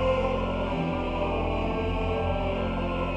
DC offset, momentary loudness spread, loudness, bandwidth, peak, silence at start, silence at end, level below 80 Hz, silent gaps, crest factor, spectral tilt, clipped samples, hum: under 0.1%; 2 LU; -28 LUFS; 8.4 kHz; -14 dBFS; 0 s; 0 s; -36 dBFS; none; 12 dB; -8 dB/octave; under 0.1%; none